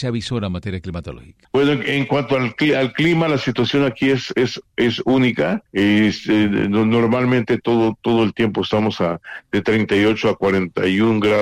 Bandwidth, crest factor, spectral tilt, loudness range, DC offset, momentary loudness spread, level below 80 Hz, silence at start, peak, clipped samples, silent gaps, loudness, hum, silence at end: 11.5 kHz; 10 dB; -6.5 dB/octave; 2 LU; under 0.1%; 7 LU; -48 dBFS; 0 s; -8 dBFS; under 0.1%; none; -18 LUFS; none; 0 s